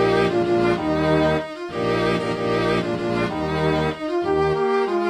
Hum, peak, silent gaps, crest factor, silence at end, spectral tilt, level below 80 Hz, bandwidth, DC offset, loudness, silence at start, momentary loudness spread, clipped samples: none; -6 dBFS; none; 14 dB; 0 s; -6.5 dB/octave; -42 dBFS; 12 kHz; under 0.1%; -21 LUFS; 0 s; 5 LU; under 0.1%